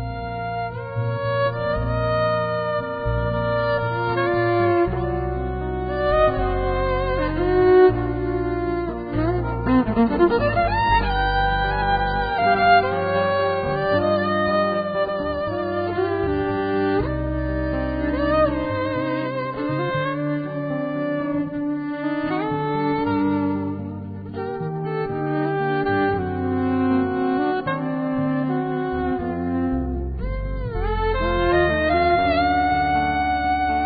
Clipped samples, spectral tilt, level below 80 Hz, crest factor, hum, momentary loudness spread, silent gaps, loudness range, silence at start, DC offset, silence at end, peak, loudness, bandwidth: under 0.1%; -11.5 dB/octave; -34 dBFS; 16 dB; none; 8 LU; none; 5 LU; 0 s; under 0.1%; 0 s; -4 dBFS; -22 LUFS; 5 kHz